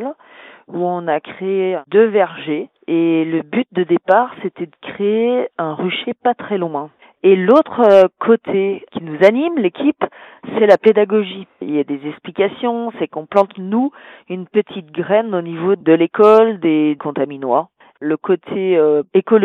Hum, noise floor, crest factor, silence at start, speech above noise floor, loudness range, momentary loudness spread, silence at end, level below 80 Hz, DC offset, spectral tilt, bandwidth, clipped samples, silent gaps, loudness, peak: none; -42 dBFS; 16 dB; 0 s; 27 dB; 5 LU; 14 LU; 0 s; -70 dBFS; under 0.1%; -8 dB/octave; 6.4 kHz; under 0.1%; none; -16 LUFS; 0 dBFS